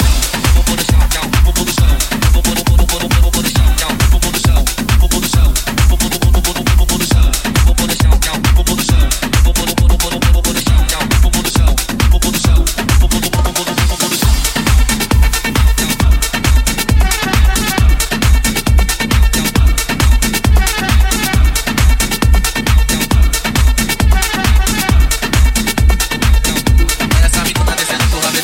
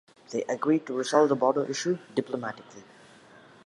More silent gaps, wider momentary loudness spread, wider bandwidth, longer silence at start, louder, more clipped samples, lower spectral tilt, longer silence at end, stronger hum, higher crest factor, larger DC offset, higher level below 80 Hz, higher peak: neither; second, 1 LU vs 12 LU; first, 17 kHz vs 11.5 kHz; second, 0 s vs 0.3 s; first, -13 LUFS vs -27 LUFS; neither; about the same, -4 dB/octave vs -5 dB/octave; second, 0 s vs 0.85 s; neither; second, 10 dB vs 22 dB; neither; first, -12 dBFS vs -80 dBFS; first, 0 dBFS vs -8 dBFS